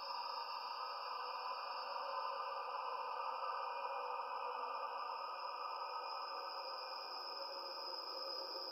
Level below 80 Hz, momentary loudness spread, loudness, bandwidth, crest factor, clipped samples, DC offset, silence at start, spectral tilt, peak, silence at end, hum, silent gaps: under -90 dBFS; 2 LU; -44 LUFS; 14.5 kHz; 14 dB; under 0.1%; under 0.1%; 0 s; -0.5 dB/octave; -32 dBFS; 0 s; none; none